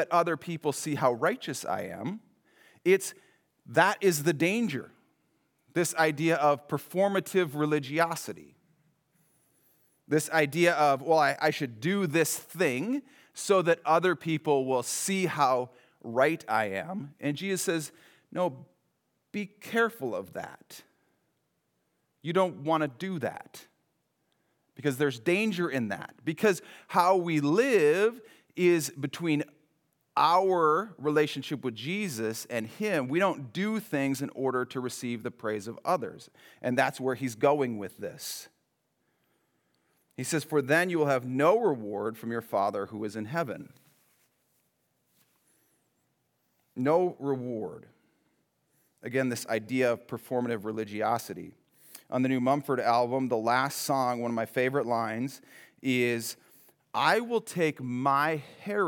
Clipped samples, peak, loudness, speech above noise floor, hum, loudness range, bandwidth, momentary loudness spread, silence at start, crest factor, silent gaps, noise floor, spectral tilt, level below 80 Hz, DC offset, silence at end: under 0.1%; -8 dBFS; -29 LUFS; 48 dB; none; 7 LU; over 20 kHz; 13 LU; 0 s; 22 dB; none; -77 dBFS; -5 dB/octave; -86 dBFS; under 0.1%; 0 s